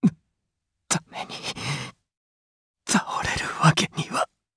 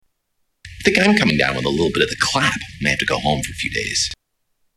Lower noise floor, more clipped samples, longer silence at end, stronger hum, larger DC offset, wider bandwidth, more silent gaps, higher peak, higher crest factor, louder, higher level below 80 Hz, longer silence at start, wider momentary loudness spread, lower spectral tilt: first, -80 dBFS vs -70 dBFS; neither; second, 0.3 s vs 0.65 s; neither; neither; second, 11 kHz vs 13.5 kHz; first, 2.17-2.74 s vs none; about the same, -2 dBFS vs -2 dBFS; first, 24 dB vs 18 dB; second, -25 LUFS vs -18 LUFS; second, -54 dBFS vs -42 dBFS; second, 0 s vs 0.65 s; first, 12 LU vs 8 LU; about the same, -4 dB/octave vs -3.5 dB/octave